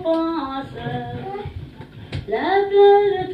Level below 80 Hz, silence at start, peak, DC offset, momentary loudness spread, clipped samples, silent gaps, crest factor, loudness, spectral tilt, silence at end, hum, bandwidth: -46 dBFS; 0 s; -4 dBFS; under 0.1%; 21 LU; under 0.1%; none; 16 dB; -19 LUFS; -8 dB/octave; 0 s; none; 5.2 kHz